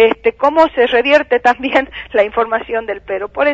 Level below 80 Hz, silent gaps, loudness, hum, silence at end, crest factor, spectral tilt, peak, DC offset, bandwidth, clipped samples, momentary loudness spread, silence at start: -46 dBFS; none; -14 LUFS; none; 0 s; 14 dB; -4.5 dB/octave; 0 dBFS; under 0.1%; 7.8 kHz; under 0.1%; 9 LU; 0 s